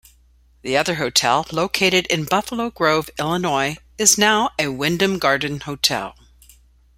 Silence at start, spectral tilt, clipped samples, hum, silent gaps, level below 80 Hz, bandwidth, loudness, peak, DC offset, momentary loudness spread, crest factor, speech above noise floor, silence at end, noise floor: 0.65 s; -2.5 dB/octave; under 0.1%; none; none; -50 dBFS; 16 kHz; -19 LUFS; 0 dBFS; under 0.1%; 9 LU; 20 dB; 35 dB; 0.85 s; -54 dBFS